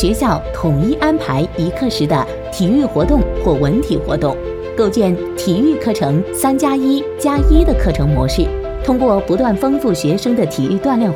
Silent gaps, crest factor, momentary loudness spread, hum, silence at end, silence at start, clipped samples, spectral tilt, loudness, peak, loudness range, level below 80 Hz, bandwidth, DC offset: none; 14 dB; 4 LU; none; 0 s; 0 s; under 0.1%; -6.5 dB/octave; -15 LUFS; 0 dBFS; 1 LU; -22 dBFS; 17.5 kHz; under 0.1%